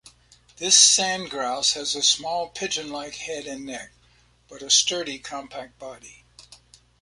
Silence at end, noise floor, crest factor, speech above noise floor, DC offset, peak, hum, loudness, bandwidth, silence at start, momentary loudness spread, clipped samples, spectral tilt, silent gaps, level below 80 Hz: 0.45 s; -59 dBFS; 24 dB; 35 dB; under 0.1%; -2 dBFS; 60 Hz at -60 dBFS; -20 LUFS; 11.5 kHz; 0.6 s; 23 LU; under 0.1%; 0.5 dB/octave; none; -62 dBFS